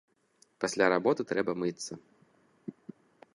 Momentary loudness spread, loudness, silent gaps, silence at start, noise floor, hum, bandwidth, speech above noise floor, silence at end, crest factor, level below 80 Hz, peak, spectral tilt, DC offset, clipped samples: 22 LU; -30 LUFS; none; 0.6 s; -68 dBFS; none; 11.5 kHz; 38 dB; 0.65 s; 24 dB; -74 dBFS; -8 dBFS; -4.5 dB/octave; under 0.1%; under 0.1%